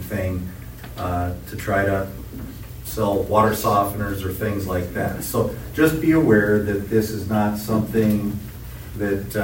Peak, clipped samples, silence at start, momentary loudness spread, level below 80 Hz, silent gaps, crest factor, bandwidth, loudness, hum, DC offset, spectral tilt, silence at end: -4 dBFS; under 0.1%; 0 s; 17 LU; -40 dBFS; none; 18 dB; 16.5 kHz; -22 LUFS; none; under 0.1%; -6.5 dB/octave; 0 s